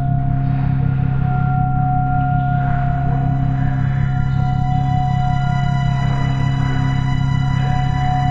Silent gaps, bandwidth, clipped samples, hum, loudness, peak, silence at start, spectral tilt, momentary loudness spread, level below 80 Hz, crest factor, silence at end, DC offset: none; 7.4 kHz; under 0.1%; none; -18 LUFS; -4 dBFS; 0 s; -8.5 dB/octave; 1 LU; -26 dBFS; 12 dB; 0 s; under 0.1%